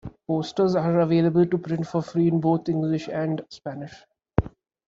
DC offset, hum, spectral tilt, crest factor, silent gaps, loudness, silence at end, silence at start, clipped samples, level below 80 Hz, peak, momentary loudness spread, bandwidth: under 0.1%; none; -8.5 dB/octave; 22 dB; none; -24 LUFS; 0.4 s; 0.05 s; under 0.1%; -46 dBFS; -2 dBFS; 15 LU; 7.4 kHz